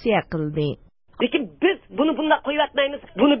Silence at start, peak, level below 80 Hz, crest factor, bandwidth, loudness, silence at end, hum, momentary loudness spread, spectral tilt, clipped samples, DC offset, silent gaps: 0 s; -6 dBFS; -52 dBFS; 16 dB; 5.8 kHz; -22 LUFS; 0 s; none; 7 LU; -10.5 dB/octave; under 0.1%; under 0.1%; none